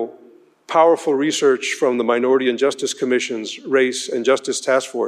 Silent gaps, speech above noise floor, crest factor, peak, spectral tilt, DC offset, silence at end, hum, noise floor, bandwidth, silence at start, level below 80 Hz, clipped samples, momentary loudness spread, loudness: none; 31 dB; 16 dB; -2 dBFS; -3 dB/octave; under 0.1%; 0 s; none; -49 dBFS; 13.5 kHz; 0 s; -76 dBFS; under 0.1%; 6 LU; -18 LUFS